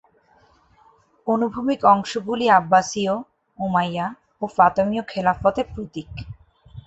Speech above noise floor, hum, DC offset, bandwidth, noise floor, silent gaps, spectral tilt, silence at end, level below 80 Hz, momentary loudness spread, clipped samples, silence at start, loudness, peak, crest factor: 37 dB; none; under 0.1%; 8.2 kHz; -57 dBFS; none; -5.5 dB/octave; 0.05 s; -50 dBFS; 16 LU; under 0.1%; 1.25 s; -21 LUFS; -2 dBFS; 20 dB